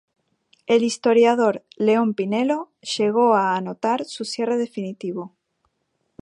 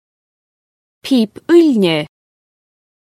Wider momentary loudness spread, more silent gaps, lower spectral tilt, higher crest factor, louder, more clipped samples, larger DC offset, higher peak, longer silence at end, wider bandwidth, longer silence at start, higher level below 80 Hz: second, 13 LU vs 17 LU; neither; about the same, -5 dB/octave vs -6 dB/octave; about the same, 16 dB vs 16 dB; second, -21 LUFS vs -13 LUFS; neither; neither; second, -4 dBFS vs 0 dBFS; about the same, 0.95 s vs 1 s; second, 11 kHz vs 14 kHz; second, 0.7 s vs 1.05 s; second, -74 dBFS vs -66 dBFS